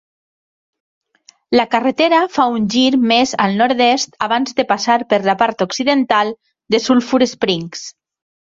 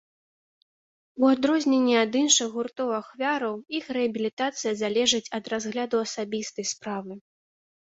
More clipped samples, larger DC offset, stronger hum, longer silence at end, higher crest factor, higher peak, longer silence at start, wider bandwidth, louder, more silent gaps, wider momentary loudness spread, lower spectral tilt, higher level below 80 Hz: neither; neither; neither; second, 0.55 s vs 0.7 s; about the same, 16 dB vs 20 dB; first, -2 dBFS vs -6 dBFS; first, 1.5 s vs 1.15 s; about the same, 7.8 kHz vs 8 kHz; first, -15 LUFS vs -25 LUFS; second, none vs 4.33-4.37 s; second, 6 LU vs 11 LU; first, -4 dB/octave vs -2.5 dB/octave; first, -58 dBFS vs -70 dBFS